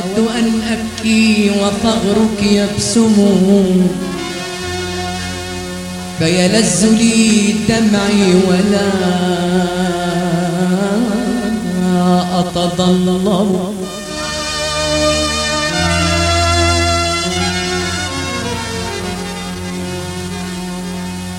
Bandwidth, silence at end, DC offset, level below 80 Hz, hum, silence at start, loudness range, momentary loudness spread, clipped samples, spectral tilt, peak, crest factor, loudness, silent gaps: 16 kHz; 0 s; under 0.1%; -34 dBFS; none; 0 s; 4 LU; 12 LU; under 0.1%; -4.5 dB/octave; 0 dBFS; 14 dB; -14 LUFS; none